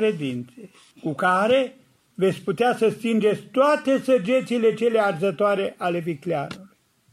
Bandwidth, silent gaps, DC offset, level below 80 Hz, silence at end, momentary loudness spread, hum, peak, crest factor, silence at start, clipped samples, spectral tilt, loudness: 13.5 kHz; none; under 0.1%; -70 dBFS; 0.45 s; 11 LU; none; -6 dBFS; 16 dB; 0 s; under 0.1%; -6 dB/octave; -22 LUFS